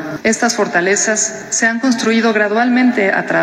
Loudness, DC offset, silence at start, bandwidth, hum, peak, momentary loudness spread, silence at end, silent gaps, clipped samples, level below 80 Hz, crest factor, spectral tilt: -14 LUFS; under 0.1%; 0 s; 12.5 kHz; none; -2 dBFS; 3 LU; 0 s; none; under 0.1%; -58 dBFS; 12 dB; -3 dB/octave